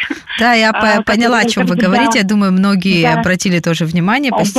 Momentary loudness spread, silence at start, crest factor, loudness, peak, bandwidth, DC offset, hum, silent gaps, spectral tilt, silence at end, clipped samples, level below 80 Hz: 4 LU; 0 s; 10 dB; -12 LUFS; -2 dBFS; 14 kHz; under 0.1%; none; none; -5 dB/octave; 0 s; under 0.1%; -46 dBFS